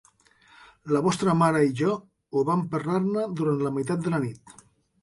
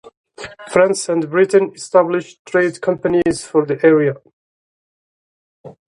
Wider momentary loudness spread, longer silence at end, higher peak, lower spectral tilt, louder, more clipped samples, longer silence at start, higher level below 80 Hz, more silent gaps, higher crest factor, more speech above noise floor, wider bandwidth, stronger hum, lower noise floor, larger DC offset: about the same, 8 LU vs 10 LU; first, 0.5 s vs 0.25 s; second, -10 dBFS vs 0 dBFS; first, -7 dB/octave vs -5.5 dB/octave; second, -25 LUFS vs -16 LUFS; neither; first, 0.85 s vs 0.05 s; second, -64 dBFS vs -56 dBFS; second, none vs 0.17-0.24 s, 2.39-2.45 s, 4.33-5.64 s; about the same, 16 dB vs 18 dB; second, 34 dB vs over 75 dB; about the same, 11.5 kHz vs 11.5 kHz; neither; second, -59 dBFS vs under -90 dBFS; neither